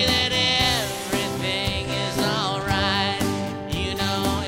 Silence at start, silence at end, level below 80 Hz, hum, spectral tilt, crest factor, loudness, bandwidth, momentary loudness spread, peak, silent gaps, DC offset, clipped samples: 0 s; 0 s; -40 dBFS; none; -3.5 dB/octave; 18 dB; -22 LUFS; 16 kHz; 7 LU; -6 dBFS; none; under 0.1%; under 0.1%